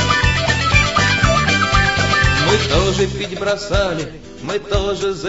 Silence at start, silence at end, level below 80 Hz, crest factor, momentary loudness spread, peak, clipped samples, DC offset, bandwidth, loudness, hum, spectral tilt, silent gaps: 0 s; 0 s; -26 dBFS; 16 dB; 9 LU; 0 dBFS; under 0.1%; 0.7%; 8 kHz; -16 LUFS; none; -4 dB/octave; none